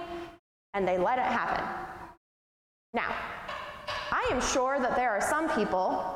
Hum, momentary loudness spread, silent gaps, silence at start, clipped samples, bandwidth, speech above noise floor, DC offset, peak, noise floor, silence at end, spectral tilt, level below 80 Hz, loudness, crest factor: none; 13 LU; 0.39-0.73 s, 2.17-2.93 s; 0 s; under 0.1%; 16 kHz; over 62 dB; under 0.1%; -16 dBFS; under -90 dBFS; 0 s; -3.5 dB/octave; -54 dBFS; -30 LUFS; 16 dB